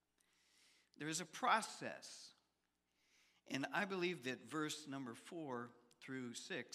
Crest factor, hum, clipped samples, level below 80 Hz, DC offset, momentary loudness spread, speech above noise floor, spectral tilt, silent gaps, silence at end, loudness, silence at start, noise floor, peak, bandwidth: 24 dB; 60 Hz at -75 dBFS; under 0.1%; under -90 dBFS; under 0.1%; 16 LU; 42 dB; -3.5 dB/octave; none; 0 s; -44 LUFS; 1 s; -87 dBFS; -22 dBFS; 15.5 kHz